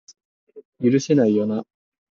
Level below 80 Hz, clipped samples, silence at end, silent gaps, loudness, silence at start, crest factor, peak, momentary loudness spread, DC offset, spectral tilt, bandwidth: -66 dBFS; under 0.1%; 0.55 s; 0.65-0.72 s; -20 LUFS; 0.55 s; 16 dB; -6 dBFS; 8 LU; under 0.1%; -7 dB/octave; 7.6 kHz